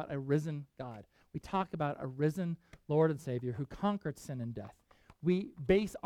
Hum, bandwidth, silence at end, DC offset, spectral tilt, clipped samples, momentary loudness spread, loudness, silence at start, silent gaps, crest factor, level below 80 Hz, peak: none; 14.5 kHz; 0.05 s; under 0.1%; -7.5 dB/octave; under 0.1%; 16 LU; -35 LUFS; 0 s; none; 20 dB; -60 dBFS; -16 dBFS